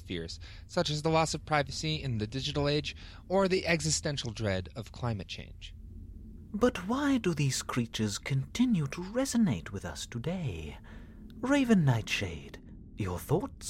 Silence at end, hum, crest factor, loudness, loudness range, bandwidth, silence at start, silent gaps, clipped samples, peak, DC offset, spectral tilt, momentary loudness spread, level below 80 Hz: 0 s; none; 20 dB; -31 LUFS; 3 LU; 16 kHz; 0 s; none; under 0.1%; -12 dBFS; under 0.1%; -5 dB/octave; 19 LU; -50 dBFS